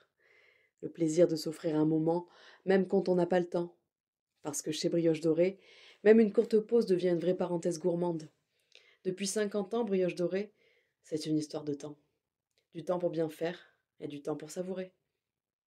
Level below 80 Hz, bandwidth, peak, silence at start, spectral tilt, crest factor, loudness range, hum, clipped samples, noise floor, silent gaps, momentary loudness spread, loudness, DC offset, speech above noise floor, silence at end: -80 dBFS; 15 kHz; -12 dBFS; 0.8 s; -6 dB/octave; 20 dB; 9 LU; none; under 0.1%; -90 dBFS; 4.00-4.13 s, 4.19-4.27 s; 15 LU; -32 LUFS; under 0.1%; 59 dB; 0.8 s